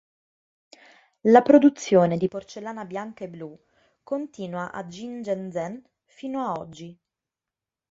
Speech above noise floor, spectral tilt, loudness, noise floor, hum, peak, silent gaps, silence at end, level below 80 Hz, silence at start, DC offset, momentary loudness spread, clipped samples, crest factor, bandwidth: 66 dB; -6.5 dB/octave; -23 LUFS; -89 dBFS; none; -2 dBFS; none; 1 s; -70 dBFS; 1.25 s; under 0.1%; 23 LU; under 0.1%; 24 dB; 7.8 kHz